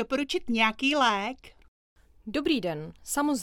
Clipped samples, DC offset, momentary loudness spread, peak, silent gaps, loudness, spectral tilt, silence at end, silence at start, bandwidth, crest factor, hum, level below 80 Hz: under 0.1%; under 0.1%; 13 LU; -10 dBFS; 1.68-1.96 s; -27 LUFS; -3 dB/octave; 0 s; 0 s; 18 kHz; 18 dB; none; -56 dBFS